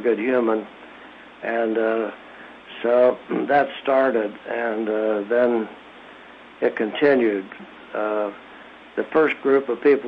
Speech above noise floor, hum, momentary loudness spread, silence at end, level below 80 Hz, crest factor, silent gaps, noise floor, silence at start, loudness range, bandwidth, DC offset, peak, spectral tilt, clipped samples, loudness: 23 dB; none; 23 LU; 0 s; -68 dBFS; 16 dB; none; -44 dBFS; 0 s; 3 LU; 5.2 kHz; under 0.1%; -6 dBFS; -7.5 dB/octave; under 0.1%; -22 LUFS